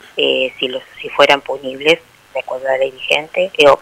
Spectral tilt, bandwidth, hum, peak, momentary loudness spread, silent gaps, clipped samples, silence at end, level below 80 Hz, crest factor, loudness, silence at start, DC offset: -3 dB/octave; 15.5 kHz; none; 0 dBFS; 13 LU; none; 0.2%; 0 s; -56 dBFS; 16 dB; -15 LUFS; 0.15 s; under 0.1%